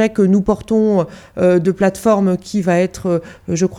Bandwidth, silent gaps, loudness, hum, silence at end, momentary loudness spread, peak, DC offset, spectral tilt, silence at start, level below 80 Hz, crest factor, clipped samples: 13.5 kHz; none; -16 LUFS; none; 0 s; 6 LU; -2 dBFS; under 0.1%; -7 dB/octave; 0 s; -44 dBFS; 14 dB; under 0.1%